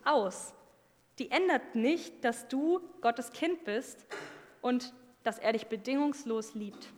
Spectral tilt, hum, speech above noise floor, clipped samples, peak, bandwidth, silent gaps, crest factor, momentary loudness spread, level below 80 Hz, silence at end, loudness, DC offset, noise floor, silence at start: -4 dB/octave; none; 33 dB; under 0.1%; -14 dBFS; 18 kHz; none; 20 dB; 14 LU; -82 dBFS; 0 s; -33 LUFS; under 0.1%; -66 dBFS; 0.05 s